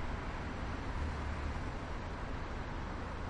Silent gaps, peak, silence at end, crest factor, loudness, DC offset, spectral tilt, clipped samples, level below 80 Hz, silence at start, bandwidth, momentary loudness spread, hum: none; -28 dBFS; 0 s; 12 dB; -42 LUFS; under 0.1%; -6.5 dB/octave; under 0.1%; -42 dBFS; 0 s; 10.5 kHz; 3 LU; none